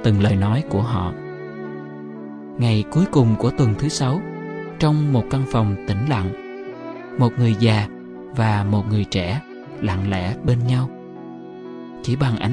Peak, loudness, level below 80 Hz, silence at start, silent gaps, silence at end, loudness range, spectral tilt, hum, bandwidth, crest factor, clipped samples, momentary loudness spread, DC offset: -4 dBFS; -20 LUFS; -44 dBFS; 0 s; none; 0 s; 3 LU; -7 dB/octave; none; 10.5 kHz; 16 dB; under 0.1%; 17 LU; under 0.1%